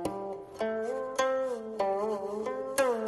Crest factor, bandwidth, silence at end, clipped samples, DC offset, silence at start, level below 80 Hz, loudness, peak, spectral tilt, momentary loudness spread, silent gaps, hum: 16 dB; 12 kHz; 0 s; under 0.1%; under 0.1%; 0 s; -66 dBFS; -32 LUFS; -14 dBFS; -3.5 dB/octave; 6 LU; none; none